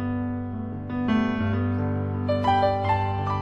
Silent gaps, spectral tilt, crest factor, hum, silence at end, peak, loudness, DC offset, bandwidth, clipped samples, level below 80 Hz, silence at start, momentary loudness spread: none; -8.5 dB/octave; 14 dB; none; 0 s; -10 dBFS; -25 LUFS; under 0.1%; 6.6 kHz; under 0.1%; -46 dBFS; 0 s; 9 LU